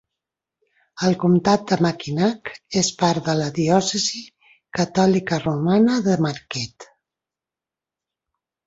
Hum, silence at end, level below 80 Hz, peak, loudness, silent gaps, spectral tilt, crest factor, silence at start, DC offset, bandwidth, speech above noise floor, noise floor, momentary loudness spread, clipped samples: none; 1.8 s; -58 dBFS; -2 dBFS; -20 LUFS; none; -5 dB/octave; 18 dB; 0.95 s; under 0.1%; 8 kHz; 69 dB; -89 dBFS; 11 LU; under 0.1%